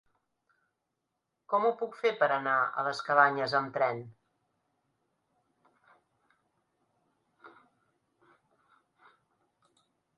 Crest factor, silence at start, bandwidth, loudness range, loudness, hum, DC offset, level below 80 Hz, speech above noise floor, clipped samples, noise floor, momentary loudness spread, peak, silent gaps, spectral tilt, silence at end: 26 dB; 1.5 s; 11 kHz; 9 LU; -29 LUFS; none; under 0.1%; -84 dBFS; 55 dB; under 0.1%; -84 dBFS; 7 LU; -10 dBFS; none; -5 dB/octave; 2.7 s